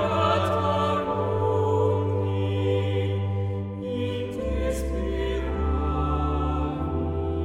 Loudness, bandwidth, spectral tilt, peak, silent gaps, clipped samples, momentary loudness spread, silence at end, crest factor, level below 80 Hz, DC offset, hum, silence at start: -26 LUFS; 12 kHz; -7.5 dB/octave; -10 dBFS; none; under 0.1%; 6 LU; 0 s; 16 dB; -32 dBFS; under 0.1%; none; 0 s